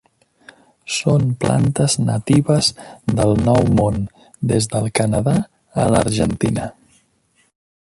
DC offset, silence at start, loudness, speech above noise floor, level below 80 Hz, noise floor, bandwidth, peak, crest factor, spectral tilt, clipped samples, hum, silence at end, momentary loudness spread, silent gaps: under 0.1%; 0.85 s; -18 LUFS; 45 dB; -38 dBFS; -61 dBFS; 11.5 kHz; -2 dBFS; 16 dB; -5.5 dB/octave; under 0.1%; none; 1.15 s; 11 LU; none